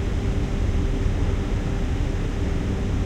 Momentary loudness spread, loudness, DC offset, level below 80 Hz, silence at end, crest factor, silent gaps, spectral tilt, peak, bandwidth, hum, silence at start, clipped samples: 2 LU; -26 LUFS; under 0.1%; -26 dBFS; 0 s; 12 dB; none; -7 dB/octave; -10 dBFS; 9.2 kHz; none; 0 s; under 0.1%